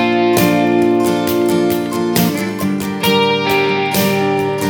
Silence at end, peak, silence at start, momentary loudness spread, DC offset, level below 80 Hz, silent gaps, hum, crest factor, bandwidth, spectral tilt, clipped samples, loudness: 0 s; 0 dBFS; 0 s; 5 LU; under 0.1%; -50 dBFS; none; none; 14 dB; over 20 kHz; -5 dB/octave; under 0.1%; -14 LUFS